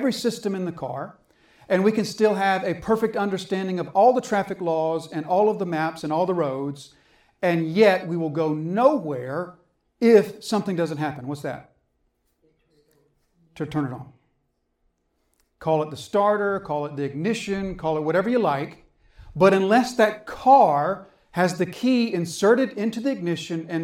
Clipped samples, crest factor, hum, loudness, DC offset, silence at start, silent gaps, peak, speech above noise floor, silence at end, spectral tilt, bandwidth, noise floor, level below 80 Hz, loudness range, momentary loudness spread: under 0.1%; 20 dB; none; -23 LUFS; under 0.1%; 0 s; none; -4 dBFS; 50 dB; 0 s; -6 dB/octave; 16 kHz; -72 dBFS; -58 dBFS; 12 LU; 13 LU